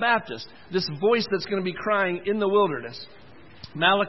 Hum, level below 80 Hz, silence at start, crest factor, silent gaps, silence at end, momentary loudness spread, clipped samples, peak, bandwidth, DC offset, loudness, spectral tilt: none; -64 dBFS; 0 s; 20 dB; none; 0 s; 18 LU; under 0.1%; -4 dBFS; 6 kHz; 0.4%; -24 LUFS; -6 dB/octave